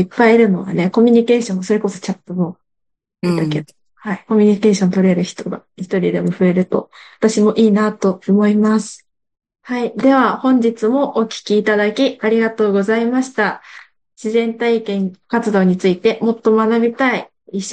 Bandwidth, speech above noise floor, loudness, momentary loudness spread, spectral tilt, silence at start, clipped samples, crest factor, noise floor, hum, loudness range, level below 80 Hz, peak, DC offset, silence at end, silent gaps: 9.4 kHz; 60 dB; -16 LUFS; 11 LU; -6.5 dB/octave; 0 s; under 0.1%; 14 dB; -75 dBFS; none; 2 LU; -62 dBFS; -2 dBFS; under 0.1%; 0 s; none